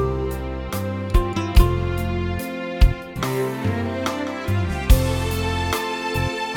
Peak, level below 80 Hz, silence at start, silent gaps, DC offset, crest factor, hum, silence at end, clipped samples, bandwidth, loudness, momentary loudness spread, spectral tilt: -2 dBFS; -24 dBFS; 0 s; none; under 0.1%; 20 dB; none; 0 s; under 0.1%; 18.5 kHz; -23 LUFS; 8 LU; -6 dB/octave